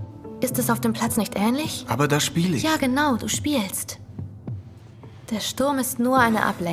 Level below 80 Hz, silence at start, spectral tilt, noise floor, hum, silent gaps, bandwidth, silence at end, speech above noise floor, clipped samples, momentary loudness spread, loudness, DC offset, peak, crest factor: -52 dBFS; 0 s; -4 dB/octave; -43 dBFS; none; none; 16.5 kHz; 0 s; 21 dB; under 0.1%; 16 LU; -23 LUFS; under 0.1%; -4 dBFS; 20 dB